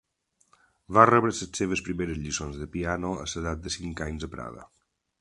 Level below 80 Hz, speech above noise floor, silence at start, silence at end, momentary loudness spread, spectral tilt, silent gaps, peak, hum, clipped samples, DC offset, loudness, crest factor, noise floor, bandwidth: -46 dBFS; 44 dB; 0.9 s; 0.55 s; 16 LU; -4.5 dB/octave; none; 0 dBFS; none; under 0.1%; under 0.1%; -27 LUFS; 28 dB; -71 dBFS; 11.5 kHz